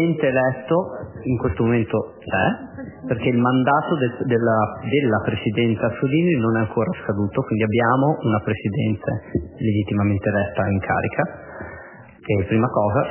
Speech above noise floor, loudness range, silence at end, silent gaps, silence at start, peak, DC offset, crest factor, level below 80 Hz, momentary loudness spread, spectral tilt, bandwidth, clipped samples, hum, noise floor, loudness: 21 dB; 3 LU; 0 s; none; 0 s; -4 dBFS; under 0.1%; 18 dB; -44 dBFS; 9 LU; -11.5 dB/octave; 3.2 kHz; under 0.1%; none; -41 dBFS; -21 LUFS